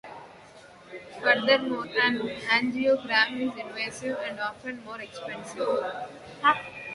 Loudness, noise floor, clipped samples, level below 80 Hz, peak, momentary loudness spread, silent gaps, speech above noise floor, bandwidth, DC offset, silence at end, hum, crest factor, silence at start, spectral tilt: -26 LUFS; -50 dBFS; under 0.1%; -66 dBFS; -6 dBFS; 16 LU; none; 23 dB; 11.5 kHz; under 0.1%; 0 s; none; 24 dB; 0.05 s; -3.5 dB/octave